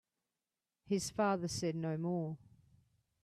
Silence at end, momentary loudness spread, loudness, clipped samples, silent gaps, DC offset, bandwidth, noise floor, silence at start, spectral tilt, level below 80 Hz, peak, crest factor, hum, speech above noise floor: 0.85 s; 7 LU; -37 LUFS; under 0.1%; none; under 0.1%; 14 kHz; under -90 dBFS; 0.85 s; -5.5 dB/octave; -70 dBFS; -22 dBFS; 18 dB; none; over 53 dB